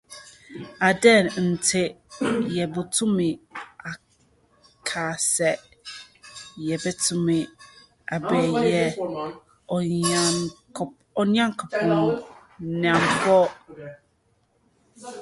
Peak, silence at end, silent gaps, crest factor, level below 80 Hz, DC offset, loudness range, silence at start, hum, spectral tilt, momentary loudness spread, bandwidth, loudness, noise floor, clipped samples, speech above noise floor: -2 dBFS; 0 s; none; 22 dB; -60 dBFS; under 0.1%; 5 LU; 0.1 s; none; -4 dB/octave; 22 LU; 12 kHz; -23 LUFS; -66 dBFS; under 0.1%; 44 dB